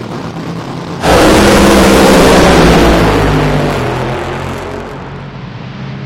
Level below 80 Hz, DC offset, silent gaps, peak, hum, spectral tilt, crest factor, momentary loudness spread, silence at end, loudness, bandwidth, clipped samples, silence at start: -20 dBFS; under 0.1%; none; 0 dBFS; none; -5 dB/octave; 10 dB; 19 LU; 0 s; -7 LUFS; 17 kHz; 0.6%; 0 s